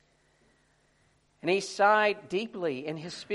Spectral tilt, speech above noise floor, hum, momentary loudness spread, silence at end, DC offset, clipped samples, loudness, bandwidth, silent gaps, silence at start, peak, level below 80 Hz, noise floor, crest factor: -4 dB/octave; 40 dB; none; 14 LU; 0 s; under 0.1%; under 0.1%; -28 LUFS; 11.5 kHz; none; 1.45 s; -10 dBFS; -74 dBFS; -68 dBFS; 20 dB